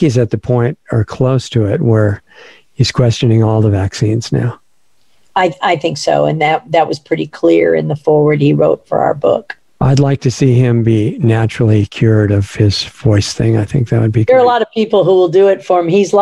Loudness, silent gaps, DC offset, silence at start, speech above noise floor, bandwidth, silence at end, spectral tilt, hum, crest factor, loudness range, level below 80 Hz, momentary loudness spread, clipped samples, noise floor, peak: -12 LUFS; none; 0.3%; 0 s; 50 dB; 11 kHz; 0 s; -7 dB/octave; none; 12 dB; 3 LU; -42 dBFS; 6 LU; under 0.1%; -61 dBFS; 0 dBFS